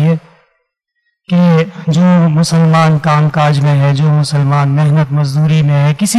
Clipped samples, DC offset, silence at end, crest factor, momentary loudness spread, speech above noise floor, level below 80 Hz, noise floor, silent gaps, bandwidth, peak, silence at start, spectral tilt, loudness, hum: under 0.1%; under 0.1%; 0 s; 6 dB; 4 LU; 57 dB; -52 dBFS; -67 dBFS; none; 13 kHz; -4 dBFS; 0 s; -6.5 dB/octave; -11 LUFS; none